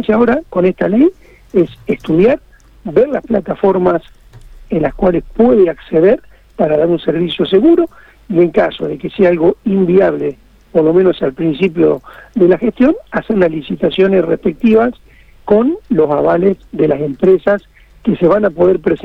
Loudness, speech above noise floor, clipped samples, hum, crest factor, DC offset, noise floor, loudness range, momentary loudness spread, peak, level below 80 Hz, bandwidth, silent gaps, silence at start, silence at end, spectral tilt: -13 LUFS; 24 dB; under 0.1%; none; 12 dB; under 0.1%; -36 dBFS; 2 LU; 7 LU; 0 dBFS; -40 dBFS; 5.2 kHz; none; 0 s; 0.05 s; -9 dB/octave